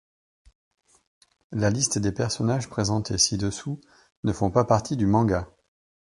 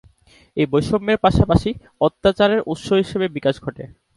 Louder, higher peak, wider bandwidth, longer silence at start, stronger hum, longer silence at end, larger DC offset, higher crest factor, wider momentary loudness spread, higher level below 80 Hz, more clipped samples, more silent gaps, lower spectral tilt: second, -25 LUFS vs -19 LUFS; second, -4 dBFS vs 0 dBFS; about the same, 11.5 kHz vs 11.5 kHz; first, 1.5 s vs 0.55 s; neither; first, 0.7 s vs 0.3 s; neither; about the same, 22 dB vs 18 dB; about the same, 12 LU vs 12 LU; second, -46 dBFS vs -36 dBFS; neither; first, 4.17-4.23 s vs none; second, -4.5 dB/octave vs -7 dB/octave